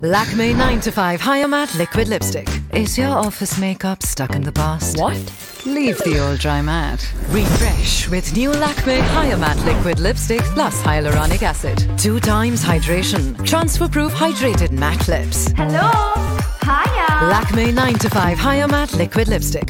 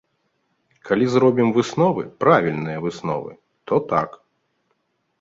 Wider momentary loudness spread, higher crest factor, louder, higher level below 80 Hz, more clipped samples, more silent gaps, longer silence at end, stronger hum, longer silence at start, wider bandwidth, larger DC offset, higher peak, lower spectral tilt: second, 5 LU vs 10 LU; second, 12 dB vs 18 dB; first, -17 LUFS vs -20 LUFS; first, -24 dBFS vs -60 dBFS; neither; neither; second, 0 s vs 1.1 s; neither; second, 0 s vs 0.85 s; first, 18 kHz vs 7.8 kHz; neither; about the same, -4 dBFS vs -2 dBFS; second, -5 dB/octave vs -7 dB/octave